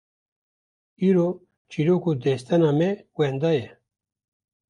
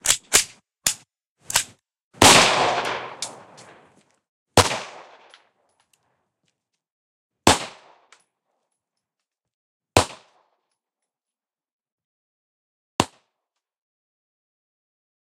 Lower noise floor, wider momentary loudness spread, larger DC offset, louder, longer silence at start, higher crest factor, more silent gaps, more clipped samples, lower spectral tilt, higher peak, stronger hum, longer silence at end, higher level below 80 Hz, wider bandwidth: about the same, under -90 dBFS vs under -90 dBFS; second, 7 LU vs 20 LU; neither; second, -23 LUFS vs -19 LUFS; first, 1 s vs 0.05 s; second, 16 dB vs 26 dB; second, 1.57-1.65 s vs 1.27-1.36 s, 2.03-2.11 s, 4.29-4.46 s, 6.92-7.30 s, 9.54-9.80 s, 11.72-11.79 s, 11.92-11.98 s, 12.04-12.99 s; neither; first, -8 dB/octave vs -2 dB/octave; second, -10 dBFS vs 0 dBFS; neither; second, 1.05 s vs 2.25 s; second, -66 dBFS vs -50 dBFS; second, 10.5 kHz vs 16 kHz